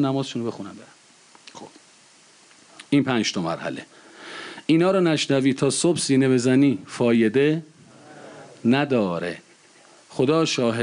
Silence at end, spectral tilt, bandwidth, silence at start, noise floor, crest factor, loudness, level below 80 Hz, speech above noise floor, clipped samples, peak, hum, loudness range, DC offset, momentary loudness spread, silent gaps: 0 s; -5 dB/octave; 11 kHz; 0 s; -53 dBFS; 14 dB; -21 LUFS; -68 dBFS; 32 dB; under 0.1%; -8 dBFS; none; 8 LU; under 0.1%; 20 LU; none